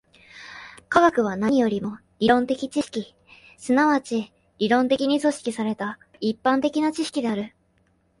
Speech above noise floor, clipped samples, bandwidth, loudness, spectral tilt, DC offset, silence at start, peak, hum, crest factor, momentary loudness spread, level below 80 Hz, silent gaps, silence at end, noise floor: 43 dB; under 0.1%; 11.5 kHz; -23 LUFS; -5 dB/octave; under 0.1%; 0.35 s; -2 dBFS; none; 20 dB; 18 LU; -62 dBFS; none; 0.7 s; -65 dBFS